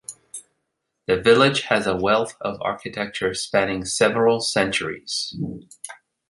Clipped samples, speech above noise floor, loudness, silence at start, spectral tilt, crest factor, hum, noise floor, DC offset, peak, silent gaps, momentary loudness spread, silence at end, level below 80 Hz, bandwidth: under 0.1%; 56 dB; -21 LUFS; 0.1 s; -3.5 dB/octave; 20 dB; none; -77 dBFS; under 0.1%; -2 dBFS; none; 20 LU; 0.35 s; -54 dBFS; 11.5 kHz